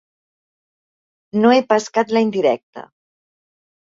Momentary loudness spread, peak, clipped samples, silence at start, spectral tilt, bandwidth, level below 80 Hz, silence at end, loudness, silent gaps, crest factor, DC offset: 8 LU; -2 dBFS; under 0.1%; 1.35 s; -5 dB/octave; 7.8 kHz; -66 dBFS; 1.15 s; -17 LUFS; 2.63-2.73 s; 18 dB; under 0.1%